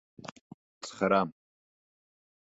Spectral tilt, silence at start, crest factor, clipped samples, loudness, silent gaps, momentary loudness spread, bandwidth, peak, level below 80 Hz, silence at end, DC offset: -5.5 dB/octave; 0.25 s; 24 dB; under 0.1%; -29 LUFS; 0.32-0.81 s; 21 LU; 8 kHz; -12 dBFS; -70 dBFS; 1.1 s; under 0.1%